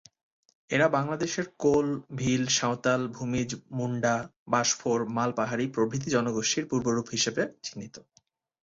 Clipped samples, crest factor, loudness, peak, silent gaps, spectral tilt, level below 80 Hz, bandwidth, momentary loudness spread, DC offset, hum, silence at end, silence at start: under 0.1%; 20 dB; -28 LUFS; -8 dBFS; 4.36-4.46 s; -4 dB/octave; -62 dBFS; 7.8 kHz; 7 LU; under 0.1%; none; 0.65 s; 0.7 s